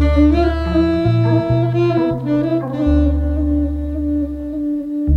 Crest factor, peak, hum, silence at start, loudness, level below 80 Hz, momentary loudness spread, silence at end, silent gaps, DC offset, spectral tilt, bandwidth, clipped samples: 14 dB; -2 dBFS; none; 0 s; -17 LUFS; -22 dBFS; 7 LU; 0 s; none; under 0.1%; -9.5 dB/octave; 6 kHz; under 0.1%